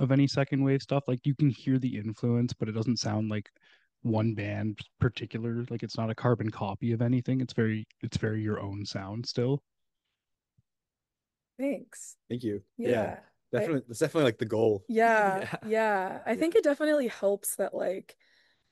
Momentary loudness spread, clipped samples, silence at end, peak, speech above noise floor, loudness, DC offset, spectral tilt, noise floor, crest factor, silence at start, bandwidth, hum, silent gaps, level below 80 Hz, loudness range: 10 LU; under 0.1%; 0.7 s; -12 dBFS; over 61 dB; -30 LUFS; under 0.1%; -6.5 dB/octave; under -90 dBFS; 18 dB; 0 s; 12.5 kHz; none; none; -64 dBFS; 9 LU